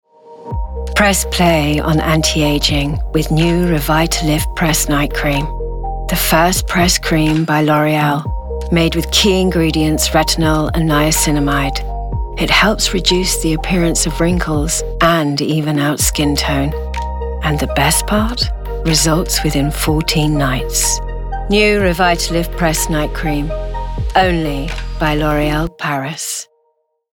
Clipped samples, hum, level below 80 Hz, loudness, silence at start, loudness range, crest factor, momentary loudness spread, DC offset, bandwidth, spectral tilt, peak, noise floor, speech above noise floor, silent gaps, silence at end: under 0.1%; none; -22 dBFS; -15 LUFS; 0.25 s; 2 LU; 14 dB; 10 LU; under 0.1%; 20 kHz; -4 dB/octave; 0 dBFS; -64 dBFS; 50 dB; none; 0.7 s